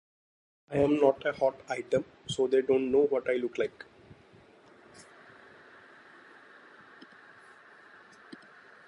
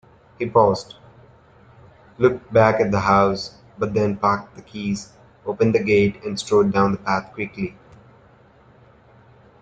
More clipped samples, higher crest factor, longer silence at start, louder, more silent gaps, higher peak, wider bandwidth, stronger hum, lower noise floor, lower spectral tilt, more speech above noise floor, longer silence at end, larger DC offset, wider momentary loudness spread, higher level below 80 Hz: neither; about the same, 22 dB vs 20 dB; first, 0.7 s vs 0.4 s; second, -29 LUFS vs -20 LUFS; neither; second, -10 dBFS vs -2 dBFS; first, 10.5 kHz vs 9.2 kHz; neither; first, -58 dBFS vs -52 dBFS; about the same, -6 dB/octave vs -6.5 dB/octave; about the same, 30 dB vs 32 dB; second, 0.55 s vs 1.9 s; neither; first, 26 LU vs 14 LU; second, -66 dBFS vs -52 dBFS